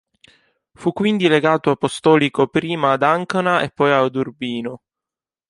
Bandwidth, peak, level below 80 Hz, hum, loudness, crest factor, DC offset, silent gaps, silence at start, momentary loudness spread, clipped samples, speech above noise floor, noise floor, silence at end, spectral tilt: 11.5 kHz; -2 dBFS; -60 dBFS; none; -18 LUFS; 16 dB; under 0.1%; none; 0.8 s; 10 LU; under 0.1%; 71 dB; -89 dBFS; 0.7 s; -6 dB/octave